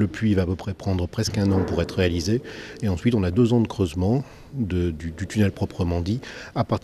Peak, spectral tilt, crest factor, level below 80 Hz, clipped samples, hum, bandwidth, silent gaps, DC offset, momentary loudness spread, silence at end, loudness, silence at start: -8 dBFS; -7 dB/octave; 16 dB; -42 dBFS; under 0.1%; none; 13.5 kHz; none; under 0.1%; 9 LU; 0.05 s; -24 LUFS; 0 s